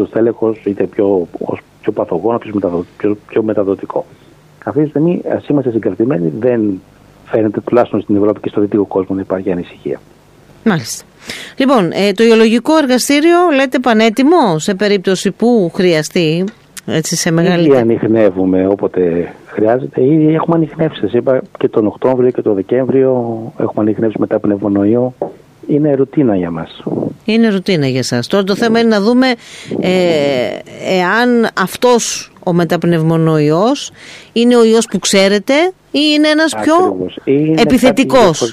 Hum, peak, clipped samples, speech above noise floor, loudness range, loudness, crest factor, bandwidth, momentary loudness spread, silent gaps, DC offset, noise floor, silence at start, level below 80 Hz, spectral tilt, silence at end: none; 0 dBFS; under 0.1%; 30 dB; 5 LU; -13 LUFS; 12 dB; 15.5 kHz; 10 LU; none; under 0.1%; -43 dBFS; 0 s; -50 dBFS; -5.5 dB/octave; 0 s